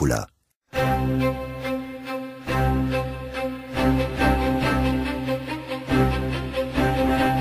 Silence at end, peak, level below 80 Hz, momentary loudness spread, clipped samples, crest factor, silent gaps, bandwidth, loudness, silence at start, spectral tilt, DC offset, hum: 0 s; -6 dBFS; -32 dBFS; 9 LU; under 0.1%; 16 dB; 0.56-0.61 s; 15.5 kHz; -24 LUFS; 0 s; -6.5 dB/octave; under 0.1%; none